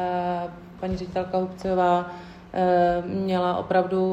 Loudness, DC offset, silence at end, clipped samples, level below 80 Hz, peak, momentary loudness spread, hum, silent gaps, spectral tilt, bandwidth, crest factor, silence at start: -25 LUFS; under 0.1%; 0 s; under 0.1%; -50 dBFS; -8 dBFS; 12 LU; none; none; -7.5 dB/octave; 8.6 kHz; 16 dB; 0 s